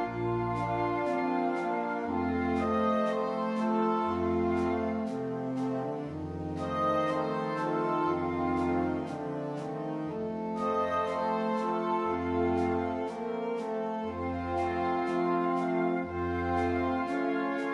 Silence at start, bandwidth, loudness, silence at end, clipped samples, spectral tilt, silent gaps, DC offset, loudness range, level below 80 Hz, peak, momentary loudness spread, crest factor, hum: 0 s; 11 kHz; -31 LUFS; 0 s; under 0.1%; -7.5 dB/octave; none; under 0.1%; 2 LU; -56 dBFS; -18 dBFS; 6 LU; 14 dB; none